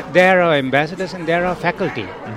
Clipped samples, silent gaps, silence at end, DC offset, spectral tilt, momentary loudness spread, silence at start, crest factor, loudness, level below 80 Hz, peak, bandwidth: under 0.1%; none; 0 s; under 0.1%; -6 dB/octave; 11 LU; 0 s; 16 dB; -17 LUFS; -48 dBFS; 0 dBFS; 13 kHz